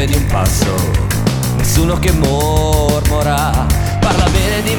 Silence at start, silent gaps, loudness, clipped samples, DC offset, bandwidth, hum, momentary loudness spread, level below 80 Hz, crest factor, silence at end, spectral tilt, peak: 0 s; none; -14 LUFS; under 0.1%; under 0.1%; 19.5 kHz; none; 2 LU; -20 dBFS; 12 dB; 0 s; -5 dB/octave; 0 dBFS